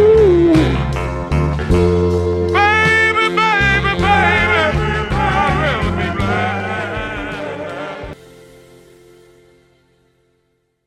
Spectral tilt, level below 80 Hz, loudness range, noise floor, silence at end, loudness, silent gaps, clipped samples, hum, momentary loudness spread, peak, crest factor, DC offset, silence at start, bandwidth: -6.5 dB/octave; -28 dBFS; 15 LU; -64 dBFS; 2.7 s; -15 LUFS; none; under 0.1%; none; 14 LU; 0 dBFS; 16 dB; under 0.1%; 0 s; 12.5 kHz